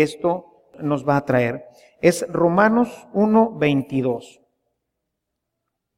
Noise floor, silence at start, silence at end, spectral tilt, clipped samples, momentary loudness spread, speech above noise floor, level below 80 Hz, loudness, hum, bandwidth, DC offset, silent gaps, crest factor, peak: -79 dBFS; 0 s; 1.75 s; -6.5 dB/octave; under 0.1%; 9 LU; 60 dB; -58 dBFS; -20 LUFS; none; 16 kHz; under 0.1%; none; 18 dB; -2 dBFS